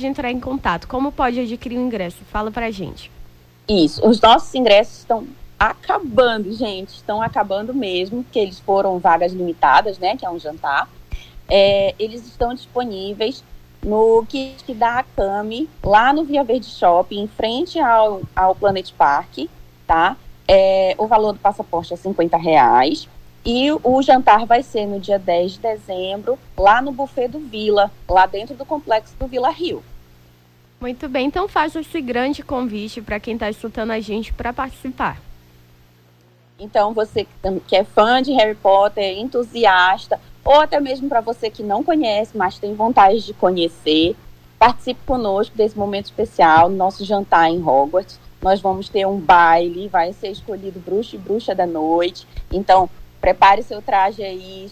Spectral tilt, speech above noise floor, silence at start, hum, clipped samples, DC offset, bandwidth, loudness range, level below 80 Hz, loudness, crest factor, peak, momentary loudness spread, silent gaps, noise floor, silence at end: -5.5 dB/octave; 35 dB; 0 s; 60 Hz at -50 dBFS; under 0.1%; under 0.1%; 15.5 kHz; 7 LU; -40 dBFS; -17 LUFS; 16 dB; -2 dBFS; 13 LU; none; -52 dBFS; 0 s